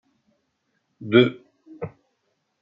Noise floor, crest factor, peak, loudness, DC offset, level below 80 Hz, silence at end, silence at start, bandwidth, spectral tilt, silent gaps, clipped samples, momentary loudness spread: -73 dBFS; 24 dB; -2 dBFS; -19 LUFS; under 0.1%; -68 dBFS; 0.75 s; 1 s; 5.2 kHz; -8.5 dB/octave; none; under 0.1%; 20 LU